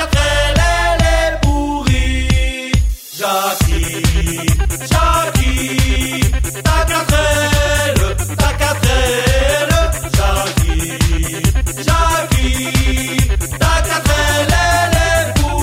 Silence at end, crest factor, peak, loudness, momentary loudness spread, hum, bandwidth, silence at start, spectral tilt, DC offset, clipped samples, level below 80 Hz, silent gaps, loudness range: 0 s; 12 dB; 0 dBFS; -15 LUFS; 3 LU; none; 16.5 kHz; 0 s; -4 dB/octave; under 0.1%; under 0.1%; -18 dBFS; none; 2 LU